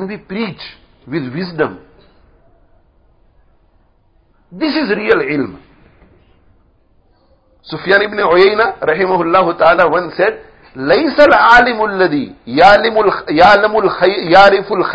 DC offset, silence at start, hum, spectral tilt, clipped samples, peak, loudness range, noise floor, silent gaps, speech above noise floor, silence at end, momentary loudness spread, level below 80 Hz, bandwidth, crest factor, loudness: under 0.1%; 0 s; none; -6 dB/octave; 0.5%; 0 dBFS; 16 LU; -53 dBFS; none; 41 dB; 0 s; 15 LU; -44 dBFS; 8 kHz; 14 dB; -11 LUFS